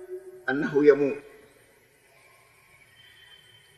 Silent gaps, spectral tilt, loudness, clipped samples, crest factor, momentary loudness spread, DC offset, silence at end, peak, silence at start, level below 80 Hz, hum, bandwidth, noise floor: none; -7 dB/octave; -24 LUFS; under 0.1%; 24 dB; 18 LU; under 0.1%; 2.6 s; -6 dBFS; 0 s; -74 dBFS; none; 12 kHz; -60 dBFS